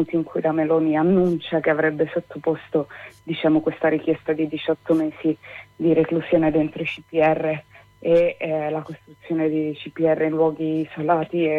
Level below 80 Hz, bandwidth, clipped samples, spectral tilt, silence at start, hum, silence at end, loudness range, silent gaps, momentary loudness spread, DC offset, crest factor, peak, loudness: -56 dBFS; 4.6 kHz; under 0.1%; -8.5 dB/octave; 0 s; none; 0 s; 2 LU; none; 10 LU; under 0.1%; 14 dB; -6 dBFS; -22 LUFS